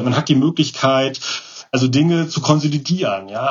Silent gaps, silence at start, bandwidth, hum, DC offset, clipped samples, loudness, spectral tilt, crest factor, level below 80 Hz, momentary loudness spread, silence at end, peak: none; 0 s; 7.6 kHz; none; under 0.1%; under 0.1%; -17 LUFS; -5.5 dB/octave; 16 dB; -62 dBFS; 8 LU; 0 s; 0 dBFS